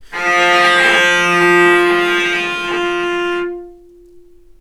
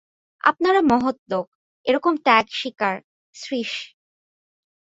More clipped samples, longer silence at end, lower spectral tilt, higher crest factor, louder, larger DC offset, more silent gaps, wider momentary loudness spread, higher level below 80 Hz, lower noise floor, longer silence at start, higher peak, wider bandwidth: neither; second, 0.4 s vs 1.1 s; second, -3 dB/octave vs -4.5 dB/octave; second, 14 dB vs 22 dB; first, -12 LUFS vs -21 LUFS; neither; second, none vs 1.19-1.26 s, 1.47-1.84 s, 3.04-3.33 s; second, 9 LU vs 15 LU; first, -50 dBFS vs -62 dBFS; second, -42 dBFS vs under -90 dBFS; second, 0 s vs 0.45 s; about the same, 0 dBFS vs -2 dBFS; first, 14.5 kHz vs 8 kHz